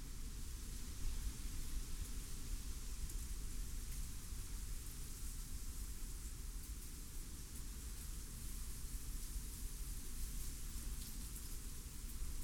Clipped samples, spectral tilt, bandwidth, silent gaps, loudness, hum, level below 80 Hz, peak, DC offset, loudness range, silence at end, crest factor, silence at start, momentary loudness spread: under 0.1%; -3.5 dB/octave; 17.5 kHz; none; -50 LUFS; none; -46 dBFS; -30 dBFS; under 0.1%; 2 LU; 0 s; 14 dB; 0 s; 3 LU